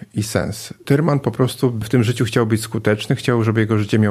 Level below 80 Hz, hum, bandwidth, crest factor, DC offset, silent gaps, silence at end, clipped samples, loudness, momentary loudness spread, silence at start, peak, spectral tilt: -50 dBFS; none; 15 kHz; 16 dB; under 0.1%; none; 0 s; under 0.1%; -18 LUFS; 5 LU; 0 s; -2 dBFS; -6.5 dB/octave